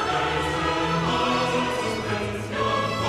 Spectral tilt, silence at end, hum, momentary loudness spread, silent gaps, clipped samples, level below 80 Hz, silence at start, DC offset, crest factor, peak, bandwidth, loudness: -4.5 dB/octave; 0 s; none; 5 LU; none; under 0.1%; -44 dBFS; 0 s; under 0.1%; 14 dB; -10 dBFS; 15 kHz; -24 LUFS